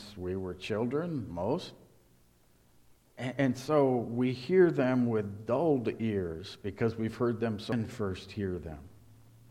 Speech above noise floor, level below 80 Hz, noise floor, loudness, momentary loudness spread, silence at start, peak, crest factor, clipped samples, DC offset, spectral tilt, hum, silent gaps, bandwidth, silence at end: 34 dB; -60 dBFS; -65 dBFS; -31 LUFS; 12 LU; 0 s; -12 dBFS; 20 dB; under 0.1%; under 0.1%; -7.5 dB/octave; none; none; 13.5 kHz; 0.35 s